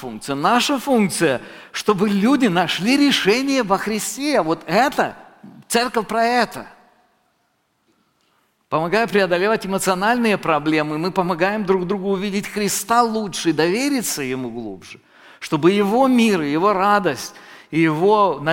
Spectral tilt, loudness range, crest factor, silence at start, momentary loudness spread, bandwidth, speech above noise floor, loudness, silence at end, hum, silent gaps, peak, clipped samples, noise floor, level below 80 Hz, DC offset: -4.5 dB/octave; 6 LU; 16 dB; 0 s; 9 LU; 17 kHz; 48 dB; -18 LUFS; 0 s; none; none; -2 dBFS; under 0.1%; -66 dBFS; -56 dBFS; under 0.1%